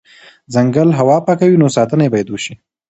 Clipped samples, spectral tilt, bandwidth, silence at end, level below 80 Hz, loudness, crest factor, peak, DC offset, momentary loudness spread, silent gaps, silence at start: under 0.1%; -7 dB/octave; 8.2 kHz; 0.35 s; -54 dBFS; -13 LUFS; 14 dB; 0 dBFS; under 0.1%; 11 LU; none; 0.5 s